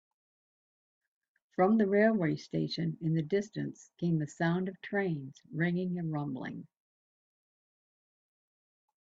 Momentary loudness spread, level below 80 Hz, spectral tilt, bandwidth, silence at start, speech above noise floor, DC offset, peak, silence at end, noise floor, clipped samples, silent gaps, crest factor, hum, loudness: 14 LU; -74 dBFS; -7.5 dB/octave; 7.8 kHz; 1.6 s; over 58 dB; under 0.1%; -14 dBFS; 2.35 s; under -90 dBFS; under 0.1%; none; 20 dB; none; -32 LUFS